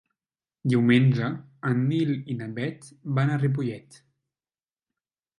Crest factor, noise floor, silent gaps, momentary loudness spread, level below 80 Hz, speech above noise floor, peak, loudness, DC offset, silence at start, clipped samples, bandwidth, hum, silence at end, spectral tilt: 18 dB; under -90 dBFS; none; 13 LU; -68 dBFS; over 66 dB; -8 dBFS; -25 LUFS; under 0.1%; 0.65 s; under 0.1%; 11 kHz; none; 1.6 s; -8 dB/octave